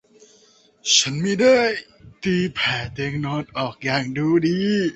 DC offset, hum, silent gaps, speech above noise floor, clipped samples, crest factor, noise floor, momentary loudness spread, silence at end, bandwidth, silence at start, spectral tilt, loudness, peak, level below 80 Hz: under 0.1%; none; none; 35 dB; under 0.1%; 18 dB; -55 dBFS; 11 LU; 0 s; 8.2 kHz; 0.85 s; -4 dB/octave; -20 LUFS; -4 dBFS; -54 dBFS